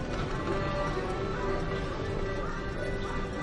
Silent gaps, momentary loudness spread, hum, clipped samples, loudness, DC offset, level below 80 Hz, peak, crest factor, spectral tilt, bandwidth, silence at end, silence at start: none; 3 LU; none; under 0.1%; -33 LUFS; under 0.1%; -38 dBFS; -18 dBFS; 12 dB; -6.5 dB/octave; 11 kHz; 0 s; 0 s